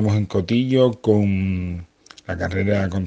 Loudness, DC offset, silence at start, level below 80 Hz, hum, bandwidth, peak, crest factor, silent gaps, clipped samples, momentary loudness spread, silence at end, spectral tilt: -20 LUFS; under 0.1%; 0 s; -46 dBFS; none; 7.8 kHz; -4 dBFS; 16 dB; none; under 0.1%; 13 LU; 0 s; -8 dB/octave